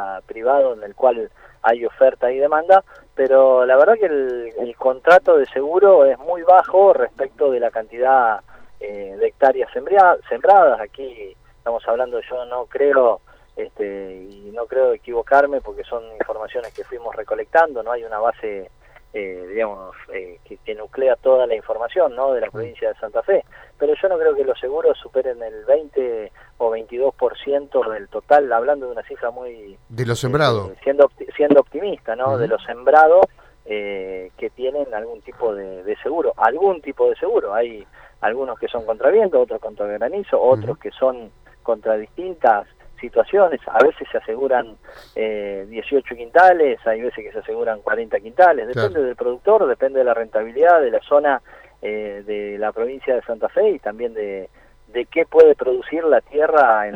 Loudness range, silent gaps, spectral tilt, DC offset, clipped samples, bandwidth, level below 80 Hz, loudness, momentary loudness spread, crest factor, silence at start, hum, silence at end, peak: 7 LU; none; -6.5 dB/octave; under 0.1%; under 0.1%; 8.8 kHz; -52 dBFS; -18 LUFS; 17 LU; 18 dB; 0 s; none; 0 s; 0 dBFS